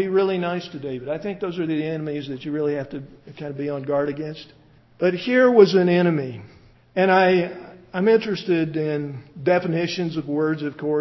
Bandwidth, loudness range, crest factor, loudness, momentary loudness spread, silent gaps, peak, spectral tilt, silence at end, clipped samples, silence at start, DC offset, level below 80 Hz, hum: 6.2 kHz; 8 LU; 20 dB; -22 LUFS; 17 LU; none; -2 dBFS; -7.5 dB/octave; 0 s; under 0.1%; 0 s; under 0.1%; -62 dBFS; none